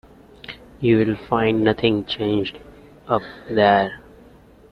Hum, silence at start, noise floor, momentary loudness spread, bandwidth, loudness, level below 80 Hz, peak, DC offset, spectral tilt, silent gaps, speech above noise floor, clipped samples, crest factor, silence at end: none; 0.5 s; -48 dBFS; 21 LU; 6 kHz; -20 LUFS; -50 dBFS; -2 dBFS; under 0.1%; -8 dB/octave; none; 29 dB; under 0.1%; 18 dB; 0.75 s